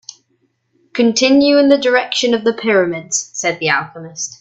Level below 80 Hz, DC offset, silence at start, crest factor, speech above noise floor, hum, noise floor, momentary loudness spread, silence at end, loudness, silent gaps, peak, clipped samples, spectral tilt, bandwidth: -60 dBFS; under 0.1%; 0.95 s; 14 dB; 49 dB; none; -63 dBFS; 12 LU; 0.1 s; -14 LUFS; none; 0 dBFS; under 0.1%; -3 dB/octave; 8.2 kHz